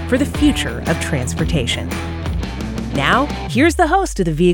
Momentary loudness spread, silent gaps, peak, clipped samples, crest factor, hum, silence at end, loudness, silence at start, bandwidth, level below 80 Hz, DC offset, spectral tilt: 9 LU; none; 0 dBFS; under 0.1%; 16 dB; none; 0 s; -18 LUFS; 0 s; 19 kHz; -28 dBFS; under 0.1%; -5 dB/octave